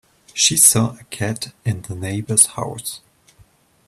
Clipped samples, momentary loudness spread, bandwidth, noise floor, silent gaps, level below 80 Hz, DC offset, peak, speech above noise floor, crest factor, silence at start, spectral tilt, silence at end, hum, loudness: under 0.1%; 18 LU; 16 kHz; -54 dBFS; none; -54 dBFS; under 0.1%; 0 dBFS; 35 dB; 20 dB; 0.35 s; -2.5 dB/octave; 0.9 s; none; -16 LUFS